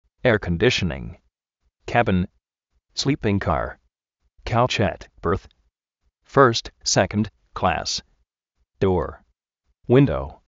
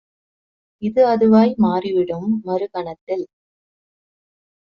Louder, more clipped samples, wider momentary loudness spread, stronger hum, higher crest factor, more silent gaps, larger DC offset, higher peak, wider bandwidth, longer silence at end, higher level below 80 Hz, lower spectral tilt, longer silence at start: second, -22 LUFS vs -18 LUFS; neither; about the same, 14 LU vs 14 LU; neither; first, 22 dB vs 16 dB; second, none vs 3.01-3.07 s; neither; about the same, -2 dBFS vs -4 dBFS; first, 8 kHz vs 5.8 kHz; second, 0.15 s vs 1.5 s; first, -42 dBFS vs -60 dBFS; second, -4.5 dB/octave vs -7 dB/octave; second, 0.25 s vs 0.8 s